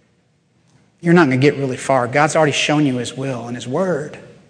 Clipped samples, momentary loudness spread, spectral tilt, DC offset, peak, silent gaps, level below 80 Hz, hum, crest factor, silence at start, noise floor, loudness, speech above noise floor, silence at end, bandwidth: under 0.1%; 11 LU; -5.5 dB/octave; under 0.1%; 0 dBFS; none; -62 dBFS; none; 18 dB; 1.05 s; -60 dBFS; -17 LUFS; 43 dB; 0.2 s; 10 kHz